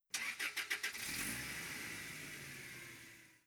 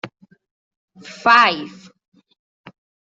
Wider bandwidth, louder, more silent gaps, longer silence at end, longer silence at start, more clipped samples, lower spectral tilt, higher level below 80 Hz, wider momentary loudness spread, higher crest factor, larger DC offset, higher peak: first, over 20 kHz vs 7.8 kHz; second, -43 LUFS vs -15 LUFS; second, none vs 0.51-0.88 s; second, 0.1 s vs 1.45 s; about the same, 0.1 s vs 0.05 s; neither; second, -1 dB/octave vs -3 dB/octave; about the same, -70 dBFS vs -68 dBFS; second, 12 LU vs 25 LU; about the same, 22 dB vs 20 dB; neither; second, -24 dBFS vs -2 dBFS